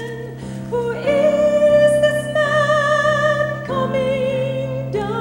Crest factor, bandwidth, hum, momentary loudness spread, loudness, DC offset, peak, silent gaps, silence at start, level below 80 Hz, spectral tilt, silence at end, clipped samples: 14 dB; 16 kHz; none; 10 LU; -17 LUFS; under 0.1%; -4 dBFS; none; 0 s; -46 dBFS; -5.5 dB/octave; 0 s; under 0.1%